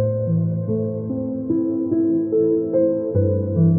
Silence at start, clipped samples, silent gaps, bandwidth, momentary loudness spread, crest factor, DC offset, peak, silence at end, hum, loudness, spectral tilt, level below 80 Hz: 0 s; under 0.1%; none; 1.8 kHz; 6 LU; 12 dB; under 0.1%; -6 dBFS; 0 s; none; -21 LUFS; -17.5 dB/octave; -54 dBFS